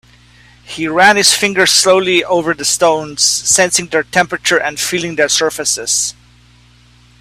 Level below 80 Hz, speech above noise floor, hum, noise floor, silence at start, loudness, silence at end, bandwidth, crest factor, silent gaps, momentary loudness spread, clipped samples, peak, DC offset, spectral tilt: -50 dBFS; 33 dB; 60 Hz at -45 dBFS; -46 dBFS; 0.7 s; -12 LUFS; 1.1 s; over 20 kHz; 14 dB; none; 7 LU; under 0.1%; 0 dBFS; under 0.1%; -1.5 dB/octave